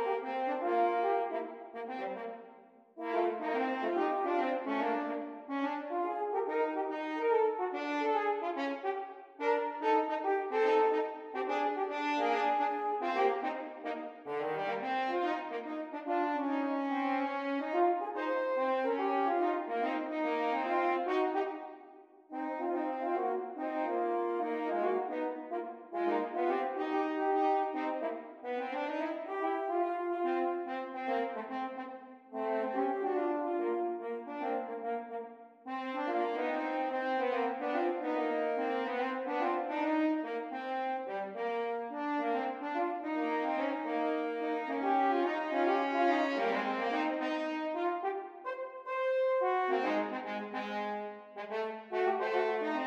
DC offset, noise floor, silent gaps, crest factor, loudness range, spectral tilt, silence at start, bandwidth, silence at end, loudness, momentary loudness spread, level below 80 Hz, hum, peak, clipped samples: under 0.1%; -58 dBFS; none; 16 dB; 4 LU; -5.5 dB/octave; 0 s; 7.8 kHz; 0 s; -34 LUFS; 9 LU; -90 dBFS; none; -18 dBFS; under 0.1%